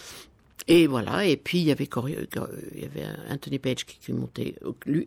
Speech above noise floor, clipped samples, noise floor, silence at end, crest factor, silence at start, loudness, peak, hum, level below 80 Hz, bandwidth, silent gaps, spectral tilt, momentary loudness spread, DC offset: 22 dB; under 0.1%; -48 dBFS; 0 s; 18 dB; 0 s; -26 LUFS; -10 dBFS; none; -58 dBFS; 16.5 kHz; none; -6 dB/octave; 17 LU; under 0.1%